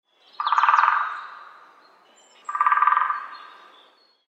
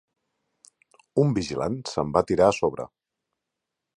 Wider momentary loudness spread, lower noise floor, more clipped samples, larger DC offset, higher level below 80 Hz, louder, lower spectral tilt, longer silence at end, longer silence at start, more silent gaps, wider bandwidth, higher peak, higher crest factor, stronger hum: first, 22 LU vs 9 LU; second, -57 dBFS vs -84 dBFS; neither; neither; second, under -90 dBFS vs -52 dBFS; first, -21 LUFS vs -24 LUFS; second, 2 dB/octave vs -6.5 dB/octave; second, 0.8 s vs 1.1 s; second, 0.4 s vs 1.15 s; neither; second, 8.2 kHz vs 11 kHz; first, -2 dBFS vs -6 dBFS; about the same, 22 dB vs 22 dB; neither